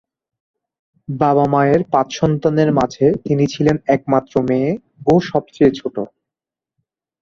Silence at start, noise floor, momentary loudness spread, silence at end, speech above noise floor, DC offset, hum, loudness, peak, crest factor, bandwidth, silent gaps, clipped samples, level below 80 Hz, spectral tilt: 1.1 s; -87 dBFS; 8 LU; 1.15 s; 72 dB; under 0.1%; none; -16 LUFS; -2 dBFS; 16 dB; 7.4 kHz; none; under 0.1%; -50 dBFS; -7.5 dB/octave